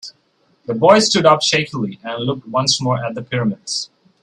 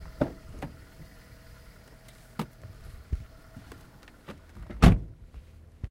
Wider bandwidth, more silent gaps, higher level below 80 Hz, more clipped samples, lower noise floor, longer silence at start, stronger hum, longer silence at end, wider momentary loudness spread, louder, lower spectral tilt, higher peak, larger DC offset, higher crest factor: second, 12 kHz vs 16 kHz; neither; second, -58 dBFS vs -36 dBFS; neither; first, -60 dBFS vs -52 dBFS; about the same, 0.05 s vs 0 s; neither; first, 0.4 s vs 0.05 s; second, 14 LU vs 30 LU; first, -16 LUFS vs -28 LUFS; second, -4 dB/octave vs -7 dB/octave; about the same, 0 dBFS vs -2 dBFS; neither; second, 18 dB vs 28 dB